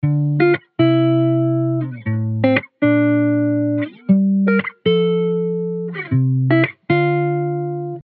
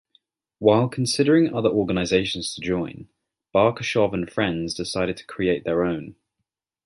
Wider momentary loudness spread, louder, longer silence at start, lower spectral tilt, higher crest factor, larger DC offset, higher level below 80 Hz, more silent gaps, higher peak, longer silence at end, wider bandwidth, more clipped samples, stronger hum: about the same, 7 LU vs 9 LU; first, -18 LUFS vs -22 LUFS; second, 0.05 s vs 0.6 s; first, -12 dB/octave vs -5.5 dB/octave; about the same, 16 dB vs 20 dB; neither; second, -58 dBFS vs -50 dBFS; neither; about the same, -2 dBFS vs -4 dBFS; second, 0 s vs 0.75 s; second, 4.6 kHz vs 11.5 kHz; neither; neither